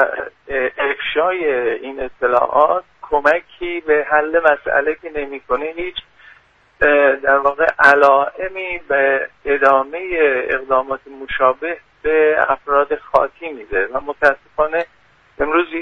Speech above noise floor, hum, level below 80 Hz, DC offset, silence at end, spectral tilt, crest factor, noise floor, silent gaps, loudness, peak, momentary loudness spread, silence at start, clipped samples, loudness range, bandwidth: 34 dB; none; -46 dBFS; under 0.1%; 0 s; -5 dB/octave; 18 dB; -50 dBFS; none; -17 LUFS; 0 dBFS; 12 LU; 0 s; under 0.1%; 4 LU; 9.4 kHz